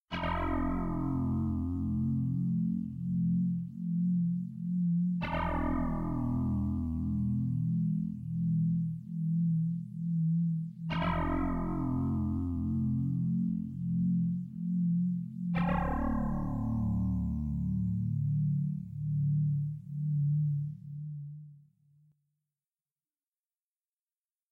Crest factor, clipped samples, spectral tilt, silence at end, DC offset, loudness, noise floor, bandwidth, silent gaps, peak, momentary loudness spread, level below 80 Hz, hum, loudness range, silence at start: 12 dB; under 0.1%; -10 dB/octave; 2.95 s; under 0.1%; -33 LUFS; under -90 dBFS; 4.7 kHz; none; -20 dBFS; 6 LU; -46 dBFS; none; 2 LU; 0.1 s